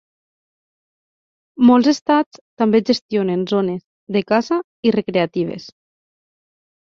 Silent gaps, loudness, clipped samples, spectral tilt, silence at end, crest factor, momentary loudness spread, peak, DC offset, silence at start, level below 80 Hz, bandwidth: 2.02-2.06 s, 2.26-2.31 s, 2.41-2.57 s, 3.02-3.09 s, 3.85-4.07 s, 4.64-4.83 s; -18 LUFS; under 0.1%; -6 dB/octave; 1.15 s; 18 dB; 11 LU; -2 dBFS; under 0.1%; 1.6 s; -62 dBFS; 7.2 kHz